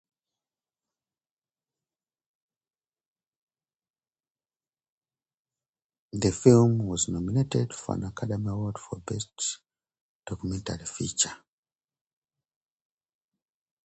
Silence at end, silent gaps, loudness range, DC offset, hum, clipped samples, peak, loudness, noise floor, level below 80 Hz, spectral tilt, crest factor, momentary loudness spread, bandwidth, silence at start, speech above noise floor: 2.5 s; 10.01-10.23 s; 8 LU; under 0.1%; none; under 0.1%; -4 dBFS; -27 LUFS; under -90 dBFS; -54 dBFS; -5.5 dB/octave; 26 dB; 16 LU; 9 kHz; 6.15 s; over 63 dB